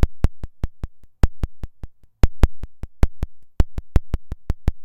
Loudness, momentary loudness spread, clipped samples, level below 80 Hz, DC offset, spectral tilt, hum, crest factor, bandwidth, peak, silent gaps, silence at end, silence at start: -27 LUFS; 16 LU; under 0.1%; -24 dBFS; under 0.1%; -7.5 dB/octave; none; 20 dB; 8.4 kHz; 0 dBFS; none; 0 s; 0 s